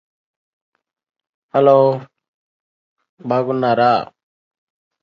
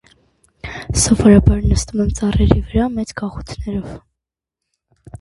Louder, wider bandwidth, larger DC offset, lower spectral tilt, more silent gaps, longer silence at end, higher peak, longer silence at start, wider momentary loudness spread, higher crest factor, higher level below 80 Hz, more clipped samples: about the same, -16 LUFS vs -16 LUFS; second, 6.2 kHz vs 11.5 kHz; neither; first, -8.5 dB/octave vs -6 dB/octave; first, 2.28-2.96 s, 3.09-3.17 s vs none; first, 1 s vs 0.05 s; about the same, 0 dBFS vs 0 dBFS; first, 1.55 s vs 0.65 s; second, 16 LU vs 19 LU; about the same, 20 dB vs 18 dB; second, -66 dBFS vs -24 dBFS; neither